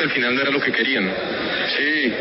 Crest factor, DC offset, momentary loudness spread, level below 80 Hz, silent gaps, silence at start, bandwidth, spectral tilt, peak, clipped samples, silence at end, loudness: 12 dB; under 0.1%; 5 LU; -56 dBFS; none; 0 s; 5.8 kHz; -1 dB/octave; -8 dBFS; under 0.1%; 0 s; -19 LUFS